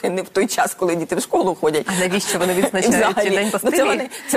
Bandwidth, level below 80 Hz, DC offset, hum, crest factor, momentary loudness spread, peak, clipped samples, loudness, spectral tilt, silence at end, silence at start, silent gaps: 15 kHz; -56 dBFS; under 0.1%; none; 16 dB; 4 LU; -4 dBFS; under 0.1%; -18 LUFS; -3.5 dB/octave; 0 s; 0 s; none